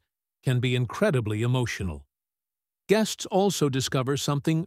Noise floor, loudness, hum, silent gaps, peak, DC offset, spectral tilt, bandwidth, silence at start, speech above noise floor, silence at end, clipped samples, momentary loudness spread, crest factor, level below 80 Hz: under -90 dBFS; -26 LUFS; none; none; -8 dBFS; under 0.1%; -5.5 dB/octave; 15.5 kHz; 0.45 s; over 65 dB; 0 s; under 0.1%; 7 LU; 18 dB; -52 dBFS